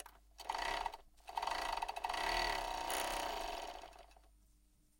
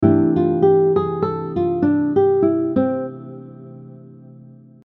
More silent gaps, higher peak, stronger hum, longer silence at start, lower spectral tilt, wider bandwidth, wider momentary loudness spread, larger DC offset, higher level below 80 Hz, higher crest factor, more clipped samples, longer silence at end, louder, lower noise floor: neither; second, -24 dBFS vs 0 dBFS; neither; about the same, 0 s vs 0 s; second, -1.5 dB/octave vs -12 dB/octave; first, 17 kHz vs 4.2 kHz; second, 16 LU vs 21 LU; neither; about the same, -56 dBFS vs -54 dBFS; about the same, 18 dB vs 18 dB; neither; first, 0.7 s vs 0.55 s; second, -41 LUFS vs -18 LUFS; first, -70 dBFS vs -43 dBFS